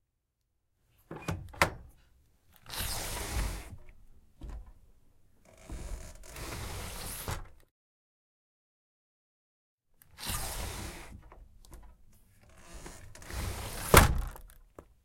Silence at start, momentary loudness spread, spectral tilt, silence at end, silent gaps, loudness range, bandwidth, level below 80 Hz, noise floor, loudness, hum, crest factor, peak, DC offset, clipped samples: 1.1 s; 21 LU; -3.5 dB/octave; 0.2 s; 7.71-9.78 s; 15 LU; 16.5 kHz; -42 dBFS; -81 dBFS; -32 LUFS; none; 32 dB; -4 dBFS; under 0.1%; under 0.1%